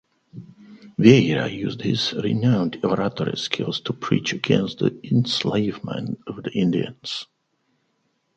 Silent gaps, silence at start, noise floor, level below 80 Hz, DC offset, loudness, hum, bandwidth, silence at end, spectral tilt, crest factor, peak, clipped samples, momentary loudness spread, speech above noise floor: none; 0.35 s; -70 dBFS; -58 dBFS; under 0.1%; -22 LUFS; none; 8.6 kHz; 1.15 s; -6 dB/octave; 22 dB; 0 dBFS; under 0.1%; 13 LU; 48 dB